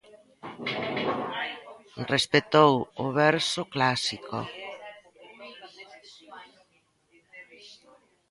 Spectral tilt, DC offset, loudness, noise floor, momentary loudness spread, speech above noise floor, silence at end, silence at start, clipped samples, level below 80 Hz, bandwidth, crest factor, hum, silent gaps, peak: -4.5 dB/octave; under 0.1%; -26 LUFS; -68 dBFS; 25 LU; 43 dB; 0.55 s; 0.15 s; under 0.1%; -66 dBFS; 11.5 kHz; 26 dB; none; none; -4 dBFS